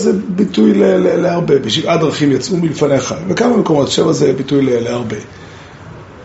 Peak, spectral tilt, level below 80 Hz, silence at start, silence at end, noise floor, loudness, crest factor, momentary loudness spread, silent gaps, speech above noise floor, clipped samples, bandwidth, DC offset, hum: 0 dBFS; -5.5 dB/octave; -48 dBFS; 0 s; 0 s; -33 dBFS; -13 LUFS; 14 dB; 14 LU; none; 21 dB; under 0.1%; 8.2 kHz; under 0.1%; none